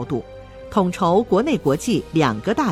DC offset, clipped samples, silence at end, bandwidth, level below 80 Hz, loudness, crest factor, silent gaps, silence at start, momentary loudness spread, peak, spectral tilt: under 0.1%; under 0.1%; 0 s; 16 kHz; -46 dBFS; -20 LUFS; 16 dB; none; 0 s; 10 LU; -4 dBFS; -6 dB/octave